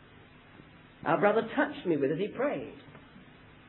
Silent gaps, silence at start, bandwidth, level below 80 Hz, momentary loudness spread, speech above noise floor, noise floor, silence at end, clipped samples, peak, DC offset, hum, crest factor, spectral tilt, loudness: none; 0.55 s; 4.2 kHz; -66 dBFS; 19 LU; 26 dB; -55 dBFS; 0.5 s; under 0.1%; -10 dBFS; under 0.1%; none; 22 dB; -10 dB/octave; -30 LUFS